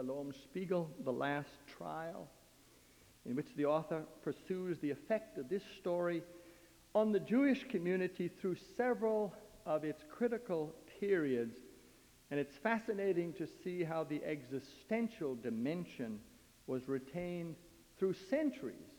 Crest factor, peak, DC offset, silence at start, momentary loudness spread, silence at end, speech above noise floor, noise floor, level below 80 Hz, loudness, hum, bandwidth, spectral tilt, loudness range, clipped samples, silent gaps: 20 dB; -20 dBFS; under 0.1%; 0 s; 12 LU; 0 s; 27 dB; -65 dBFS; -74 dBFS; -40 LUFS; none; over 20 kHz; -7 dB/octave; 5 LU; under 0.1%; none